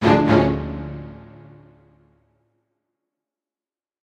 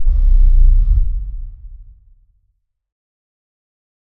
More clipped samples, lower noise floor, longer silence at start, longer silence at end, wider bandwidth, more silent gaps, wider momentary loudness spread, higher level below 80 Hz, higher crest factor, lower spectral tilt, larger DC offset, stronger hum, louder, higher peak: neither; first, under -90 dBFS vs -65 dBFS; about the same, 0 s vs 0 s; first, 2.9 s vs 2.35 s; first, 8.8 kHz vs 0.6 kHz; neither; first, 24 LU vs 20 LU; second, -42 dBFS vs -14 dBFS; first, 22 dB vs 14 dB; second, -8 dB/octave vs -10 dB/octave; neither; neither; about the same, -19 LUFS vs -17 LUFS; about the same, -2 dBFS vs 0 dBFS